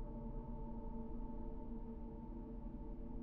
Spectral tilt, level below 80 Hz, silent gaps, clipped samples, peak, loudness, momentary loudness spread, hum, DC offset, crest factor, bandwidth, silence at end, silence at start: -11 dB/octave; -50 dBFS; none; under 0.1%; -36 dBFS; -51 LUFS; 2 LU; none; under 0.1%; 10 dB; 2.9 kHz; 0 s; 0 s